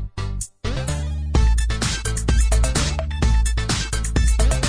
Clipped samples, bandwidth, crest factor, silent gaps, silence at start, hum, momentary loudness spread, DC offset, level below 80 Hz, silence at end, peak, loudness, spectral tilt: under 0.1%; 10.5 kHz; 12 dB; none; 0 s; none; 8 LU; under 0.1%; -20 dBFS; 0 s; -6 dBFS; -22 LUFS; -4 dB/octave